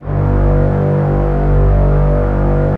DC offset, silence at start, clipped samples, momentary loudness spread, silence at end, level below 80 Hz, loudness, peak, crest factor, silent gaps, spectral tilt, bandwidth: under 0.1%; 0 s; under 0.1%; 2 LU; 0 s; -16 dBFS; -14 LUFS; -2 dBFS; 8 dB; none; -11.5 dB/octave; 3.4 kHz